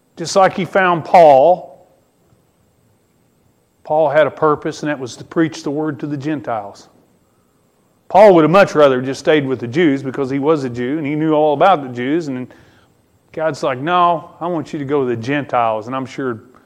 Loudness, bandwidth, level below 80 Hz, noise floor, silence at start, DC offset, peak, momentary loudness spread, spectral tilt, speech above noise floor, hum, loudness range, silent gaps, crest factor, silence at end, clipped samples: -15 LUFS; 11.5 kHz; -58 dBFS; -58 dBFS; 0.15 s; under 0.1%; 0 dBFS; 14 LU; -6 dB/octave; 43 dB; none; 7 LU; none; 16 dB; 0.25 s; under 0.1%